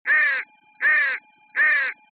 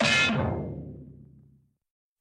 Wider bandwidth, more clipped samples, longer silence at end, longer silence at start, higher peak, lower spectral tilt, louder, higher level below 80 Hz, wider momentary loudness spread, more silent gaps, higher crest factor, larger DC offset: second, 4.7 kHz vs 12.5 kHz; neither; second, 0.2 s vs 0.95 s; about the same, 0.05 s vs 0 s; about the same, -12 dBFS vs -12 dBFS; second, -1.5 dB/octave vs -4 dB/octave; first, -20 LUFS vs -26 LUFS; second, under -90 dBFS vs -50 dBFS; second, 12 LU vs 22 LU; neither; second, 12 dB vs 18 dB; neither